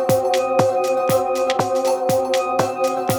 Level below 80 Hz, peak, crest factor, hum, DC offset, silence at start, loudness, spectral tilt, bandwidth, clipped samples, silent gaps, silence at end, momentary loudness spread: -56 dBFS; -2 dBFS; 16 dB; none; under 0.1%; 0 s; -19 LUFS; -4.5 dB/octave; over 20 kHz; under 0.1%; none; 0 s; 2 LU